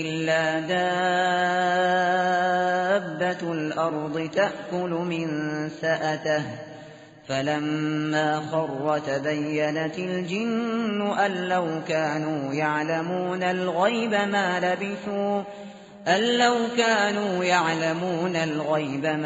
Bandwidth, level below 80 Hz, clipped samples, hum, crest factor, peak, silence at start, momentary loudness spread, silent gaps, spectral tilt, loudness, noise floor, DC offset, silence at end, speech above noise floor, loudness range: 8 kHz; -68 dBFS; under 0.1%; none; 18 dB; -8 dBFS; 0 s; 7 LU; none; -3.5 dB/octave; -25 LUFS; -45 dBFS; under 0.1%; 0 s; 21 dB; 4 LU